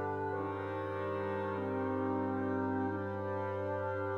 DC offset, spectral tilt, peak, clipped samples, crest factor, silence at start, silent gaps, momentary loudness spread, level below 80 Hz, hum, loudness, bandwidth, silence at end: under 0.1%; -9 dB/octave; -24 dBFS; under 0.1%; 12 dB; 0 s; none; 3 LU; -82 dBFS; none; -37 LUFS; 6.6 kHz; 0 s